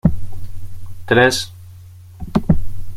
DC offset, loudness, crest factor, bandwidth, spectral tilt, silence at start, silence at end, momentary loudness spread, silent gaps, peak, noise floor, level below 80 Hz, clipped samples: under 0.1%; -17 LUFS; 16 dB; 15 kHz; -5.5 dB/octave; 0.05 s; 0 s; 23 LU; none; -2 dBFS; -39 dBFS; -30 dBFS; under 0.1%